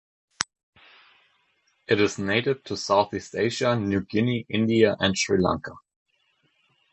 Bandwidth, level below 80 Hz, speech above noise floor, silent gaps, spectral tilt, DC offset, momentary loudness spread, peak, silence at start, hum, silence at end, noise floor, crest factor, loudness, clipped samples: 11 kHz; -54 dBFS; 45 dB; 0.63-0.73 s; -5 dB/octave; under 0.1%; 11 LU; 0 dBFS; 0.4 s; none; 1.15 s; -69 dBFS; 26 dB; -24 LUFS; under 0.1%